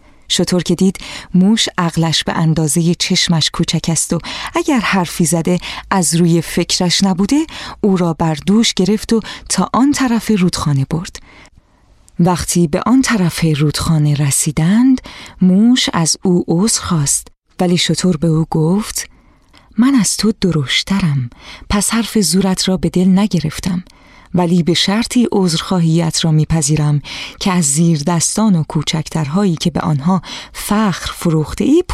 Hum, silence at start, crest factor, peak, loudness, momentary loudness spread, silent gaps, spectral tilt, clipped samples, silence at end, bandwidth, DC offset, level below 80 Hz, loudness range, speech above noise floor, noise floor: none; 0.3 s; 12 dB; -2 dBFS; -14 LUFS; 6 LU; 17.38-17.42 s; -4.5 dB/octave; under 0.1%; 0 s; 15 kHz; under 0.1%; -38 dBFS; 3 LU; 35 dB; -49 dBFS